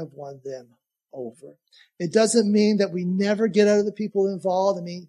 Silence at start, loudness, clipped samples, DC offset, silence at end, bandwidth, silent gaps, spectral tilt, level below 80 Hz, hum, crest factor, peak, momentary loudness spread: 0 s; -21 LUFS; under 0.1%; under 0.1%; 0.05 s; 11.5 kHz; none; -5.5 dB/octave; -76 dBFS; none; 18 dB; -6 dBFS; 19 LU